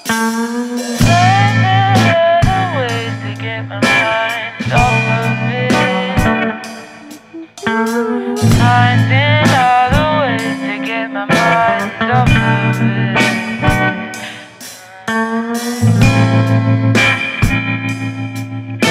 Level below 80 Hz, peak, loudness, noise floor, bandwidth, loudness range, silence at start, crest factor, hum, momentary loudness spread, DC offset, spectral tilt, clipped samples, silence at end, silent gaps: -30 dBFS; 0 dBFS; -13 LUFS; -34 dBFS; 15.5 kHz; 3 LU; 0.05 s; 14 dB; none; 12 LU; under 0.1%; -5.5 dB/octave; under 0.1%; 0 s; none